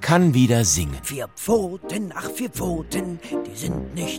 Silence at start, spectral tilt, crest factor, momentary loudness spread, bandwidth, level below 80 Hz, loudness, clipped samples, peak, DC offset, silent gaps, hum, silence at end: 0 s; -5 dB/octave; 18 dB; 12 LU; 17 kHz; -40 dBFS; -23 LUFS; under 0.1%; -4 dBFS; under 0.1%; none; none; 0 s